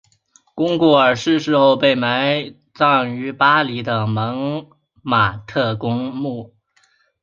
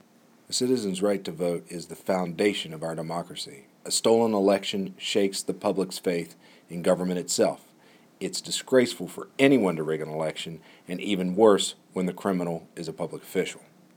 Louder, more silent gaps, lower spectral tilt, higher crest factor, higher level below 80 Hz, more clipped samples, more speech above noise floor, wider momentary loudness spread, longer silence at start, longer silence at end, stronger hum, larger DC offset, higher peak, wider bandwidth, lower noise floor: first, -17 LUFS vs -26 LUFS; neither; first, -6 dB/octave vs -4.5 dB/octave; second, 16 dB vs 22 dB; first, -54 dBFS vs -72 dBFS; neither; first, 43 dB vs 31 dB; second, 12 LU vs 15 LU; about the same, 0.55 s vs 0.5 s; first, 0.75 s vs 0.4 s; neither; neither; about the same, -2 dBFS vs -4 dBFS; second, 7.4 kHz vs 20 kHz; about the same, -60 dBFS vs -57 dBFS